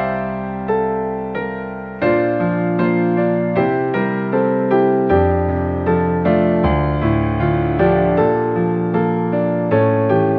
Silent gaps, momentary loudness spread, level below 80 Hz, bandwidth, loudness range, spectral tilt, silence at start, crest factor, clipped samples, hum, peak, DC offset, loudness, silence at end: none; 7 LU; -34 dBFS; 4.8 kHz; 2 LU; -11 dB/octave; 0 s; 14 dB; under 0.1%; none; -2 dBFS; under 0.1%; -17 LUFS; 0 s